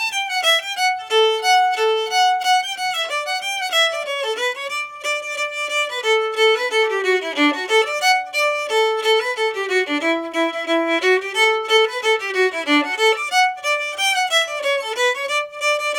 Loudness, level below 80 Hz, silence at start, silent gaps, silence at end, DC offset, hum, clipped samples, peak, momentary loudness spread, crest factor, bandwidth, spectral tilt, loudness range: -18 LUFS; -72 dBFS; 0 s; none; 0 s; under 0.1%; none; under 0.1%; -4 dBFS; 6 LU; 16 dB; 18.5 kHz; 0.5 dB/octave; 2 LU